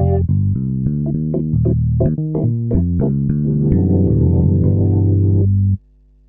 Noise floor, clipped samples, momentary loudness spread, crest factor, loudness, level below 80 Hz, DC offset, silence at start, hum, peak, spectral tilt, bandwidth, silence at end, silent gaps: -49 dBFS; under 0.1%; 5 LU; 14 dB; -16 LUFS; -28 dBFS; under 0.1%; 0 s; none; -2 dBFS; -16.5 dB/octave; 1.9 kHz; 0.5 s; none